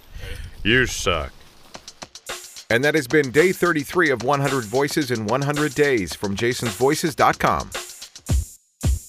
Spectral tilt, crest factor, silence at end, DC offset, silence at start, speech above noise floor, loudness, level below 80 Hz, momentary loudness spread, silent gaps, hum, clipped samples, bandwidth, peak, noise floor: -4.5 dB/octave; 20 dB; 0 s; under 0.1%; 0.1 s; 23 dB; -21 LUFS; -36 dBFS; 18 LU; none; none; under 0.1%; 15.5 kHz; -2 dBFS; -43 dBFS